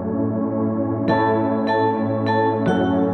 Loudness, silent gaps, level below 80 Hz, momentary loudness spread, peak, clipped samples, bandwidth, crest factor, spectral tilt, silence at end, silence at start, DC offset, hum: -20 LUFS; none; -54 dBFS; 4 LU; -4 dBFS; under 0.1%; 6.2 kHz; 14 dB; -8.5 dB/octave; 0 s; 0 s; under 0.1%; none